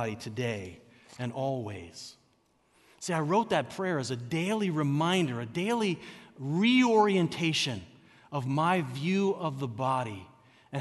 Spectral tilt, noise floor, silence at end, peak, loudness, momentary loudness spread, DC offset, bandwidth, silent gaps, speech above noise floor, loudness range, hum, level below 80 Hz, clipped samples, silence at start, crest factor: -5.5 dB/octave; -69 dBFS; 0 s; -12 dBFS; -29 LUFS; 16 LU; under 0.1%; 12 kHz; none; 40 dB; 6 LU; none; -70 dBFS; under 0.1%; 0 s; 18 dB